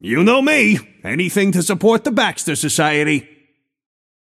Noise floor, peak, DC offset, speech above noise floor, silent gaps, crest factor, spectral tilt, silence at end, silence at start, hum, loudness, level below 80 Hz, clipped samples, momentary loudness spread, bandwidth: -60 dBFS; -2 dBFS; under 0.1%; 44 dB; none; 16 dB; -4 dB/octave; 1 s; 0.05 s; none; -16 LUFS; -60 dBFS; under 0.1%; 8 LU; 15.5 kHz